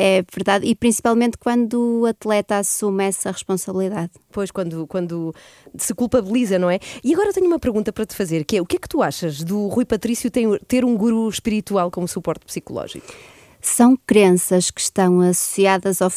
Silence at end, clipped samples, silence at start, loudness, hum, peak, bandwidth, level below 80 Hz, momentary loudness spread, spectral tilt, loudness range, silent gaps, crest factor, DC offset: 0 s; under 0.1%; 0 s; -19 LUFS; none; -2 dBFS; 15.5 kHz; -50 dBFS; 11 LU; -4.5 dB/octave; 5 LU; none; 18 dB; under 0.1%